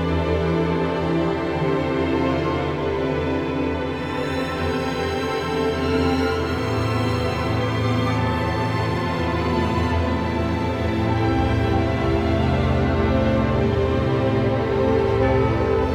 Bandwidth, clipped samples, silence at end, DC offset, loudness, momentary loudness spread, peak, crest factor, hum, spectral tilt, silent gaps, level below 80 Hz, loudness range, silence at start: 13.5 kHz; under 0.1%; 0 s; under 0.1%; -22 LUFS; 4 LU; -8 dBFS; 14 dB; none; -7.5 dB/octave; none; -32 dBFS; 3 LU; 0 s